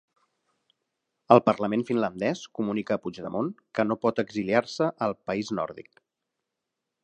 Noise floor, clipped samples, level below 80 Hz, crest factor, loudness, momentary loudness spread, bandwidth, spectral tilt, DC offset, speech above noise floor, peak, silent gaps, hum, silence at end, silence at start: -84 dBFS; under 0.1%; -68 dBFS; 24 dB; -27 LUFS; 11 LU; 9.6 kHz; -6.5 dB/octave; under 0.1%; 58 dB; -2 dBFS; none; none; 1.25 s; 1.3 s